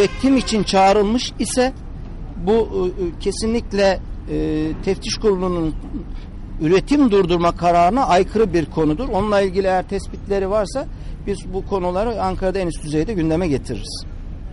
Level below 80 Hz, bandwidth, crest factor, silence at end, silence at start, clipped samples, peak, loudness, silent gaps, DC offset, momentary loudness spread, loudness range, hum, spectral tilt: -30 dBFS; 11.5 kHz; 12 dB; 0 s; 0 s; under 0.1%; -8 dBFS; -19 LUFS; none; under 0.1%; 16 LU; 5 LU; none; -5.5 dB/octave